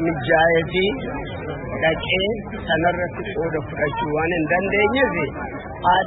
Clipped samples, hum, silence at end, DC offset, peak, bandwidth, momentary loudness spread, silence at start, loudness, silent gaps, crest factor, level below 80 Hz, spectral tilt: under 0.1%; none; 0 s; under 0.1%; -2 dBFS; 4.1 kHz; 11 LU; 0 s; -21 LUFS; none; 18 dB; -40 dBFS; -10.5 dB/octave